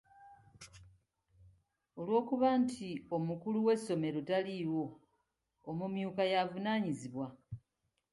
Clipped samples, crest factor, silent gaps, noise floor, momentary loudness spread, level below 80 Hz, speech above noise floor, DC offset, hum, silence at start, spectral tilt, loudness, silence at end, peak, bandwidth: under 0.1%; 18 dB; none; -84 dBFS; 21 LU; -72 dBFS; 49 dB; under 0.1%; none; 0.2 s; -6.5 dB/octave; -36 LUFS; 0.55 s; -20 dBFS; 11.5 kHz